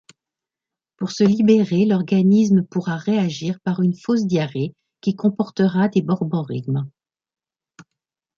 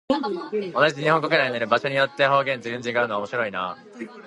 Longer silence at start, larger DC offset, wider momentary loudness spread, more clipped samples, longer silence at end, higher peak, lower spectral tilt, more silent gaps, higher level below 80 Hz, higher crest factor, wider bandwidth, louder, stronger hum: first, 1 s vs 0.1 s; neither; about the same, 10 LU vs 9 LU; neither; first, 1.5 s vs 0 s; about the same, -4 dBFS vs -4 dBFS; first, -7.5 dB/octave vs -5 dB/octave; neither; first, -62 dBFS vs -68 dBFS; about the same, 16 dB vs 20 dB; second, 7.2 kHz vs 11 kHz; first, -20 LUFS vs -23 LUFS; neither